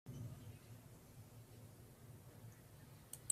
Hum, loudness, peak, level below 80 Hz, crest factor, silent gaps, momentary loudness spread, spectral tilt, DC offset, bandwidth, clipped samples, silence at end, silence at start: none; -58 LUFS; -22 dBFS; -72 dBFS; 32 dB; none; 8 LU; -4 dB/octave; under 0.1%; 15.5 kHz; under 0.1%; 0 s; 0.05 s